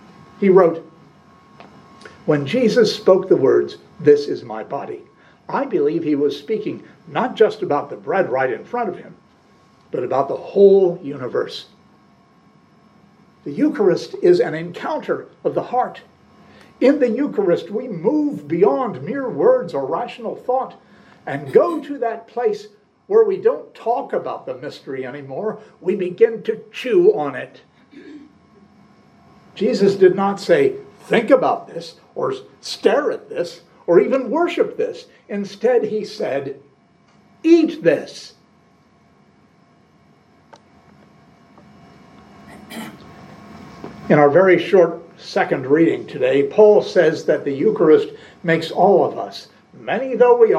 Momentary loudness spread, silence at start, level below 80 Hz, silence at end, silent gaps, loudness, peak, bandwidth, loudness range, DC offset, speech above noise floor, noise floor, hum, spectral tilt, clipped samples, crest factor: 16 LU; 0.4 s; -68 dBFS; 0 s; none; -18 LUFS; 0 dBFS; 11 kHz; 6 LU; under 0.1%; 37 dB; -54 dBFS; none; -6.5 dB/octave; under 0.1%; 18 dB